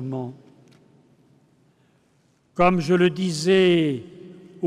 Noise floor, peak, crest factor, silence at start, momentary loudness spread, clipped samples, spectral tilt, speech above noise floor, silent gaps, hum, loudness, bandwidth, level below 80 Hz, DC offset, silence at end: -63 dBFS; -8 dBFS; 16 dB; 0 s; 19 LU; under 0.1%; -6 dB/octave; 43 dB; none; none; -20 LUFS; 11.5 kHz; -56 dBFS; under 0.1%; 0 s